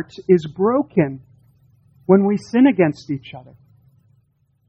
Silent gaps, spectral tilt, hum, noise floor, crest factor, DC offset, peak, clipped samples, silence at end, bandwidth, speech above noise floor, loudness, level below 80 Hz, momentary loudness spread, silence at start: none; -8.5 dB/octave; none; -62 dBFS; 18 dB; under 0.1%; -2 dBFS; under 0.1%; 1.3 s; 8.4 kHz; 45 dB; -18 LUFS; -58 dBFS; 15 LU; 0 s